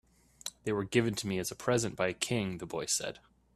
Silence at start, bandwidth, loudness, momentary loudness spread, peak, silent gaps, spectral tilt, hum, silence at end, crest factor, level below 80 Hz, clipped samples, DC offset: 0.45 s; 14 kHz; -33 LUFS; 12 LU; -12 dBFS; none; -4 dB/octave; none; 0.35 s; 22 dB; -62 dBFS; under 0.1%; under 0.1%